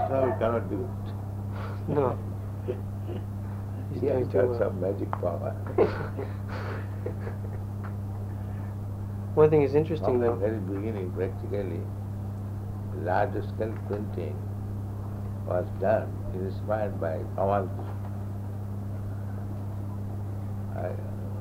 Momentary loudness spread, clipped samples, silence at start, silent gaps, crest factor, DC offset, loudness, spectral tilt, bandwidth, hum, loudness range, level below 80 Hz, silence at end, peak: 10 LU; under 0.1%; 0 s; none; 22 dB; under 0.1%; -30 LUFS; -9 dB/octave; 15 kHz; none; 6 LU; -46 dBFS; 0 s; -6 dBFS